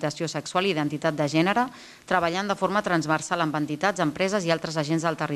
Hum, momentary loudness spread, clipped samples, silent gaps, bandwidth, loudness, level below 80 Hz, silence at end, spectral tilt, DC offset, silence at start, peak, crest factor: none; 3 LU; under 0.1%; none; 14 kHz; -25 LUFS; -62 dBFS; 0 s; -5 dB/octave; under 0.1%; 0 s; -8 dBFS; 18 dB